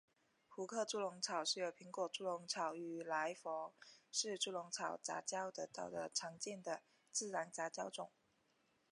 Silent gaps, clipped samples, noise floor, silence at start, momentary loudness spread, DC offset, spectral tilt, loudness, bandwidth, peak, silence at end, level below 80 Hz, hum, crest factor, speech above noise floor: none; under 0.1%; -80 dBFS; 0.5 s; 7 LU; under 0.1%; -1.5 dB/octave; -44 LUFS; 11 kHz; -26 dBFS; 0.85 s; under -90 dBFS; none; 20 dB; 35 dB